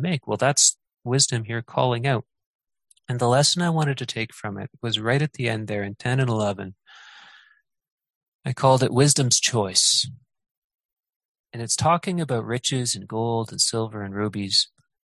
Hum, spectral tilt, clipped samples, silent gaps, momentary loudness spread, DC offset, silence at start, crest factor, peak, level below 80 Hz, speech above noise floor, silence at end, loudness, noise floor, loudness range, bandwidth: none; -3.5 dB/octave; under 0.1%; 2.46-2.59 s, 7.92-7.98 s, 8.15-8.21 s, 8.28-8.39 s, 10.51-10.70 s, 10.85-10.97 s, 11.16-11.44 s; 13 LU; under 0.1%; 0 s; 22 dB; -2 dBFS; -58 dBFS; 39 dB; 0.4 s; -22 LUFS; -61 dBFS; 6 LU; 12.5 kHz